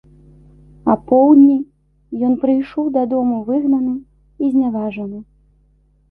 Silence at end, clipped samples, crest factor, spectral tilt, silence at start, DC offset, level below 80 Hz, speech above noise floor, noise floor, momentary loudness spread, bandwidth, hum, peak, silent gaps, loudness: 0.9 s; under 0.1%; 14 dB; -10.5 dB/octave; 0.85 s; under 0.1%; -52 dBFS; 41 dB; -56 dBFS; 18 LU; 3.5 kHz; none; -2 dBFS; none; -16 LUFS